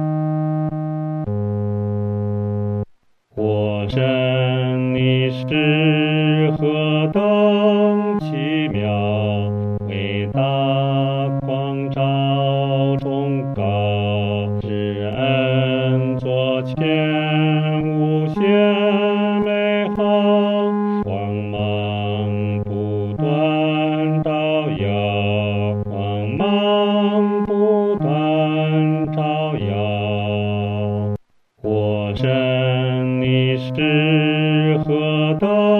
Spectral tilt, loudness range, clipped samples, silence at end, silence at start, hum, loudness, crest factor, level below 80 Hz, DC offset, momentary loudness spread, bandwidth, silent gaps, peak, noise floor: -9.5 dB/octave; 4 LU; under 0.1%; 0 s; 0 s; none; -19 LUFS; 14 dB; -52 dBFS; under 0.1%; 7 LU; 4.6 kHz; none; -4 dBFS; -53 dBFS